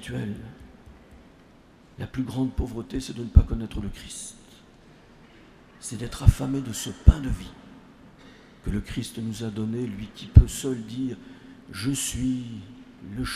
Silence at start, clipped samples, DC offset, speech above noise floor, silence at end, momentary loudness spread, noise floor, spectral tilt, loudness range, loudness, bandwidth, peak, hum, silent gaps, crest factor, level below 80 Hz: 0 s; under 0.1%; under 0.1%; 29 dB; 0 s; 19 LU; -53 dBFS; -6 dB/octave; 4 LU; -26 LUFS; 14.5 kHz; 0 dBFS; none; none; 26 dB; -30 dBFS